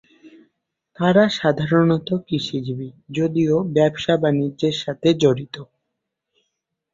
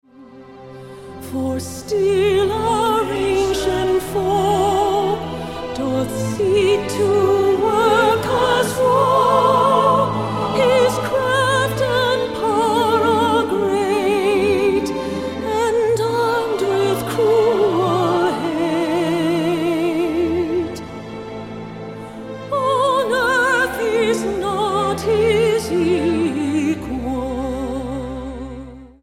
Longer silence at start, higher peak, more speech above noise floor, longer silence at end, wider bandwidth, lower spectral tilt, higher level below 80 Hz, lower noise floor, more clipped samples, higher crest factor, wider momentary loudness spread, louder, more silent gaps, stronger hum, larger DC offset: about the same, 0.25 s vs 0.2 s; about the same, -2 dBFS vs -2 dBFS; first, 60 dB vs 24 dB; first, 1.3 s vs 0.15 s; second, 7.6 kHz vs 16 kHz; first, -6.5 dB/octave vs -5 dB/octave; second, -58 dBFS vs -42 dBFS; first, -79 dBFS vs -41 dBFS; neither; about the same, 18 dB vs 16 dB; about the same, 11 LU vs 12 LU; about the same, -20 LUFS vs -18 LUFS; neither; neither; neither